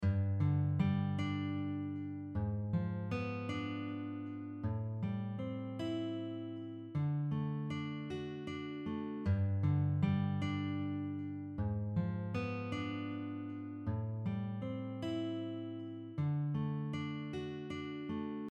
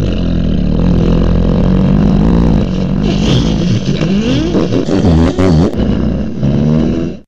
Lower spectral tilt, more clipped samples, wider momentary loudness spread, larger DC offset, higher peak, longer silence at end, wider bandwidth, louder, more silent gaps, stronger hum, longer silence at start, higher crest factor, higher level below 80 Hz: about the same, -8.5 dB/octave vs -7.5 dB/octave; neither; first, 9 LU vs 4 LU; second, under 0.1% vs 5%; second, -22 dBFS vs 0 dBFS; about the same, 0 s vs 0 s; about the same, 7.6 kHz vs 8.2 kHz; second, -39 LUFS vs -12 LUFS; neither; neither; about the same, 0 s vs 0 s; first, 16 dB vs 10 dB; second, -62 dBFS vs -18 dBFS